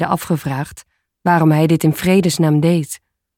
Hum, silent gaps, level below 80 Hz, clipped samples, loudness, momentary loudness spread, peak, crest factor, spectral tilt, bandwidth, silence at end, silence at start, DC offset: none; none; -50 dBFS; under 0.1%; -16 LUFS; 13 LU; -2 dBFS; 14 dB; -6.5 dB/octave; 17 kHz; 0.4 s; 0 s; under 0.1%